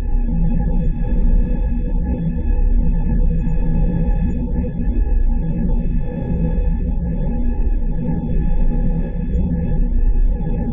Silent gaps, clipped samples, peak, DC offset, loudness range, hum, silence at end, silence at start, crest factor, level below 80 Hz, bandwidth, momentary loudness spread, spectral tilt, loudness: none; under 0.1%; -6 dBFS; under 0.1%; 1 LU; none; 0 s; 0 s; 10 dB; -16 dBFS; 2.8 kHz; 3 LU; -12 dB/octave; -21 LUFS